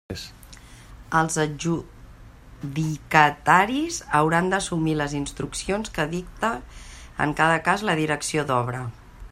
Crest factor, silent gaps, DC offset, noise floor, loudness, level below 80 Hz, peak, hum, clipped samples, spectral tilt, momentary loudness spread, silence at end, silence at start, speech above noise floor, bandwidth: 24 dB; none; under 0.1%; -45 dBFS; -23 LUFS; -46 dBFS; 0 dBFS; none; under 0.1%; -4.5 dB/octave; 17 LU; 0.05 s; 0.1 s; 22 dB; 14.5 kHz